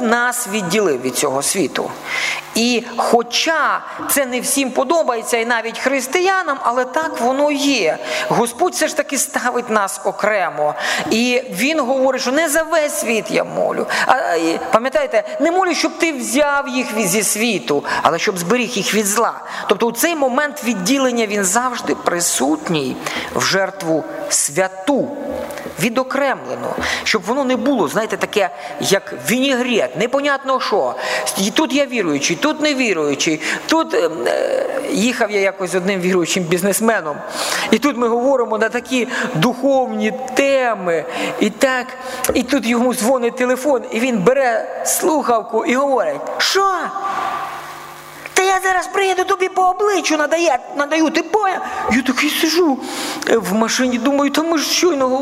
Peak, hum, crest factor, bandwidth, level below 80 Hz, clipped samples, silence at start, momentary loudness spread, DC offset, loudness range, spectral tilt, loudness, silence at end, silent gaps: 0 dBFS; none; 18 dB; 16 kHz; -54 dBFS; under 0.1%; 0 s; 5 LU; under 0.1%; 2 LU; -3 dB/octave; -17 LUFS; 0 s; none